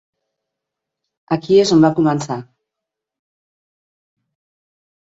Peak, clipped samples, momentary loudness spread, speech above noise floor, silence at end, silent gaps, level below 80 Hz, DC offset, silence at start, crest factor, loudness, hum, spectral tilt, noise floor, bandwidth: -2 dBFS; under 0.1%; 14 LU; 69 dB; 2.7 s; none; -58 dBFS; under 0.1%; 1.3 s; 20 dB; -15 LUFS; none; -6 dB/octave; -83 dBFS; 8 kHz